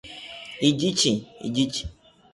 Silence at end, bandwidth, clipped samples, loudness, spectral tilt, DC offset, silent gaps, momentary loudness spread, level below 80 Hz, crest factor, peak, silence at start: 0.45 s; 11.5 kHz; under 0.1%; -24 LUFS; -4 dB/octave; under 0.1%; none; 16 LU; -50 dBFS; 20 dB; -8 dBFS; 0.05 s